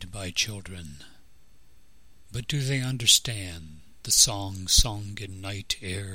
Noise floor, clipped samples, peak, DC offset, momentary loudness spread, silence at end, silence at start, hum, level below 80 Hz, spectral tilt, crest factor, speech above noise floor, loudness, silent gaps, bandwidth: -59 dBFS; under 0.1%; -2 dBFS; 0.4%; 21 LU; 0 s; 0 s; none; -38 dBFS; -1.5 dB/octave; 26 dB; 32 dB; -24 LUFS; none; 16.5 kHz